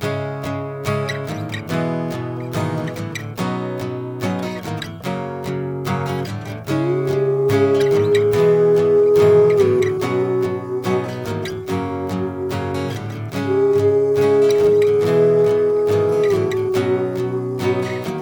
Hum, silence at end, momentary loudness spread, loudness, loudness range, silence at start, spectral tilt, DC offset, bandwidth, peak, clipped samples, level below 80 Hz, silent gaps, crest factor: none; 0 s; 12 LU; -19 LUFS; 10 LU; 0 s; -7 dB/octave; under 0.1%; over 20 kHz; -4 dBFS; under 0.1%; -54 dBFS; none; 14 dB